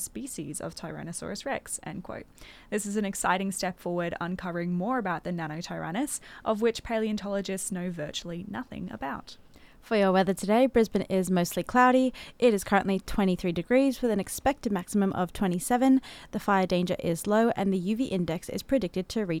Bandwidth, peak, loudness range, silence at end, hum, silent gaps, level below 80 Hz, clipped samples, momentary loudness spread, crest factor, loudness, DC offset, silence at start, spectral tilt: 16.5 kHz; -10 dBFS; 7 LU; 0 s; none; none; -52 dBFS; under 0.1%; 13 LU; 18 dB; -28 LUFS; under 0.1%; 0 s; -5 dB/octave